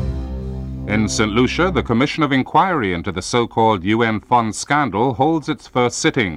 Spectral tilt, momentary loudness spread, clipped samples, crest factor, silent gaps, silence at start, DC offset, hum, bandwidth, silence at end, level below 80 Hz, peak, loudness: -5 dB/octave; 7 LU; under 0.1%; 16 dB; none; 0 s; under 0.1%; none; 12.5 kHz; 0 s; -34 dBFS; -2 dBFS; -18 LUFS